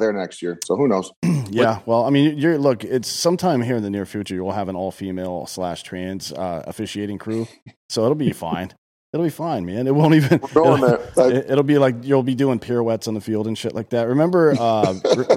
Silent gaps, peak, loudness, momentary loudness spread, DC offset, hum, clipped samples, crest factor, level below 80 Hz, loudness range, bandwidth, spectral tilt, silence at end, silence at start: 1.16-1.22 s, 7.62-7.66 s, 7.76-7.89 s, 8.78-9.13 s; -4 dBFS; -20 LUFS; 12 LU; under 0.1%; none; under 0.1%; 16 dB; -58 dBFS; 9 LU; 16 kHz; -6 dB/octave; 0 s; 0 s